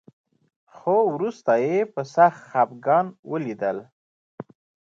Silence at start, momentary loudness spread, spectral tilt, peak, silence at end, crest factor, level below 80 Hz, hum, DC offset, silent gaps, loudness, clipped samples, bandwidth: 0.75 s; 19 LU; -7.5 dB/octave; -6 dBFS; 0.55 s; 18 dB; -76 dBFS; none; under 0.1%; 3.19-3.23 s, 3.92-4.38 s; -23 LUFS; under 0.1%; 7.6 kHz